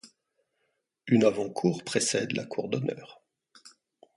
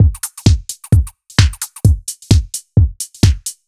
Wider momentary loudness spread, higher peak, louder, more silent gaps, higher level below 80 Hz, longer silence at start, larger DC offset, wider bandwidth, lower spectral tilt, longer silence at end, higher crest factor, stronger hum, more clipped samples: first, 11 LU vs 3 LU; second, -10 dBFS vs 0 dBFS; second, -28 LUFS vs -16 LUFS; neither; second, -70 dBFS vs -20 dBFS; about the same, 0.05 s vs 0 s; neither; second, 11.5 kHz vs 14.5 kHz; about the same, -4.5 dB/octave vs -5 dB/octave; first, 0.5 s vs 0.15 s; first, 20 dB vs 14 dB; neither; neither